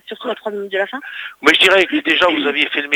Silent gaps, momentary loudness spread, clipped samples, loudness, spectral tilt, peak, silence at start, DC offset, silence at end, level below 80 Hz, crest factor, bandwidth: none; 15 LU; under 0.1%; -14 LUFS; -2.5 dB/octave; 0 dBFS; 0.1 s; under 0.1%; 0 s; -58 dBFS; 16 dB; over 20 kHz